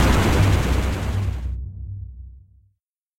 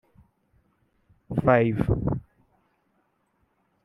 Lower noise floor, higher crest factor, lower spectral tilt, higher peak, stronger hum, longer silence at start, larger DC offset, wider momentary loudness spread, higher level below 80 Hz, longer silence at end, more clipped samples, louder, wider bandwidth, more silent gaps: about the same, -72 dBFS vs -71 dBFS; second, 16 dB vs 24 dB; second, -6 dB/octave vs -10 dB/octave; about the same, -6 dBFS vs -6 dBFS; neither; second, 0 s vs 1.3 s; neither; first, 18 LU vs 11 LU; first, -26 dBFS vs -44 dBFS; second, 0.8 s vs 1.65 s; neither; first, -21 LUFS vs -24 LUFS; first, 16.5 kHz vs 5.6 kHz; neither